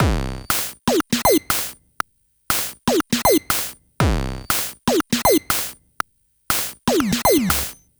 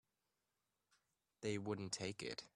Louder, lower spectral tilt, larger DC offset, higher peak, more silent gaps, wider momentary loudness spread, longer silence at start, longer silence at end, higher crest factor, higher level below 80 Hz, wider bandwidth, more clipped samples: first, -20 LUFS vs -46 LUFS; about the same, -3.5 dB/octave vs -4 dB/octave; neither; first, -2 dBFS vs -28 dBFS; neither; first, 13 LU vs 5 LU; second, 0 s vs 1.4 s; first, 0.25 s vs 0.1 s; about the same, 20 dB vs 20 dB; first, -34 dBFS vs -80 dBFS; first, over 20 kHz vs 12 kHz; neither